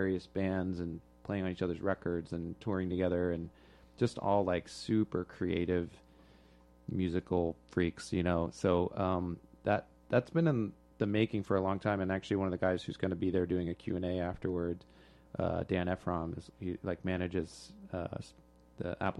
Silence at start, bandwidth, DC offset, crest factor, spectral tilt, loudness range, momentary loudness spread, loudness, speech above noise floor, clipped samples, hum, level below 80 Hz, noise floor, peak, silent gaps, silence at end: 0 s; 11.5 kHz; under 0.1%; 20 dB; -7.5 dB/octave; 4 LU; 10 LU; -35 LUFS; 27 dB; under 0.1%; none; -58 dBFS; -62 dBFS; -16 dBFS; none; 0 s